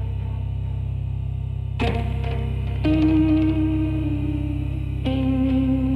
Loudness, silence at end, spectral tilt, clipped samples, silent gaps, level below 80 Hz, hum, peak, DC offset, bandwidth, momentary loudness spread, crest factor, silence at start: -23 LUFS; 0 s; -9.5 dB/octave; under 0.1%; none; -28 dBFS; none; -8 dBFS; under 0.1%; 5.4 kHz; 9 LU; 12 dB; 0 s